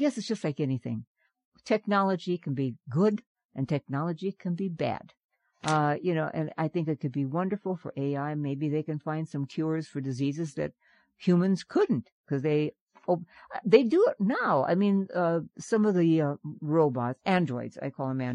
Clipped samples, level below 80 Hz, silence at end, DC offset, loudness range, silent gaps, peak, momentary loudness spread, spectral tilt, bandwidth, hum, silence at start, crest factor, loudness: under 0.1%; -72 dBFS; 0 s; under 0.1%; 6 LU; 1.07-1.15 s, 1.45-1.52 s, 3.27-3.35 s, 3.45-3.49 s, 5.24-5.29 s, 12.12-12.24 s, 12.81-12.87 s; -6 dBFS; 10 LU; -7.5 dB/octave; 10.5 kHz; none; 0 s; 22 dB; -29 LUFS